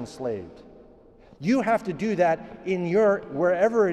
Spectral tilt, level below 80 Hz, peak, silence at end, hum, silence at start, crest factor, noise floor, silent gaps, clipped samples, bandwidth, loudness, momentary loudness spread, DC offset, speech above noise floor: -7 dB/octave; -58 dBFS; -10 dBFS; 0 s; none; 0 s; 16 dB; -52 dBFS; none; under 0.1%; 11.5 kHz; -24 LUFS; 11 LU; under 0.1%; 28 dB